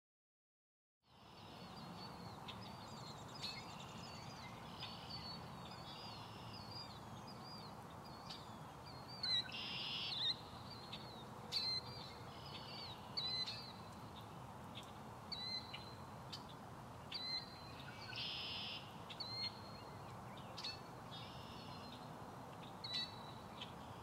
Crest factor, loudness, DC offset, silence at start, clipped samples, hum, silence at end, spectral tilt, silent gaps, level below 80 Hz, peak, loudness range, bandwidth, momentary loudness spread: 20 dB; -48 LUFS; under 0.1%; 1.05 s; under 0.1%; none; 0 s; -3.5 dB/octave; none; -70 dBFS; -30 dBFS; 8 LU; 16 kHz; 13 LU